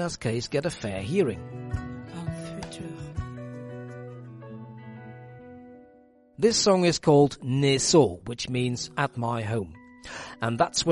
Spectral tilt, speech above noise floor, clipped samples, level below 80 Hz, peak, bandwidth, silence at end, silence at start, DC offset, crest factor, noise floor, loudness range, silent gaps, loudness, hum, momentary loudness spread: -4.5 dB/octave; 32 dB; under 0.1%; -50 dBFS; -8 dBFS; 11.5 kHz; 0 s; 0 s; under 0.1%; 20 dB; -57 dBFS; 17 LU; none; -26 LUFS; none; 23 LU